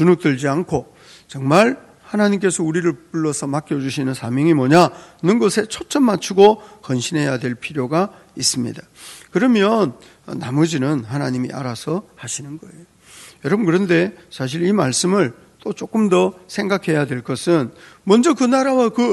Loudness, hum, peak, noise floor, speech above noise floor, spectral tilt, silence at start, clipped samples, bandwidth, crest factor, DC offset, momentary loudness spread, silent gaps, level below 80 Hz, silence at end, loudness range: -18 LUFS; none; 0 dBFS; -44 dBFS; 26 dB; -5.5 dB/octave; 0 s; under 0.1%; 12 kHz; 18 dB; under 0.1%; 13 LU; none; -58 dBFS; 0 s; 6 LU